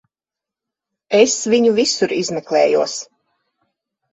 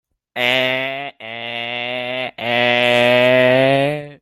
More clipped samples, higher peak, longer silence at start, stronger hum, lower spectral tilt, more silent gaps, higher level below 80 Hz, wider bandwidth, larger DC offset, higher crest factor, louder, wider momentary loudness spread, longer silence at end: neither; about the same, 0 dBFS vs 0 dBFS; first, 1.1 s vs 0.35 s; neither; second, -3 dB/octave vs -5 dB/octave; neither; about the same, -64 dBFS vs -60 dBFS; second, 8.4 kHz vs 14.5 kHz; neither; about the same, 18 dB vs 16 dB; about the same, -16 LUFS vs -16 LUFS; second, 7 LU vs 14 LU; first, 1.1 s vs 0.05 s